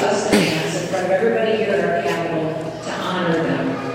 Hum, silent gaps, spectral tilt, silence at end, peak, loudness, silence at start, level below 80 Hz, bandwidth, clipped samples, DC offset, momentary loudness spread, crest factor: none; none; -5 dB/octave; 0 s; -2 dBFS; -20 LUFS; 0 s; -52 dBFS; 16 kHz; under 0.1%; under 0.1%; 7 LU; 18 dB